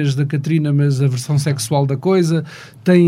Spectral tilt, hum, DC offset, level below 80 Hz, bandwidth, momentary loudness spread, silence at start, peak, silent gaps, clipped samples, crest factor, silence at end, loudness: -7 dB/octave; none; under 0.1%; -60 dBFS; 14.5 kHz; 5 LU; 0 s; -2 dBFS; none; under 0.1%; 14 dB; 0 s; -17 LUFS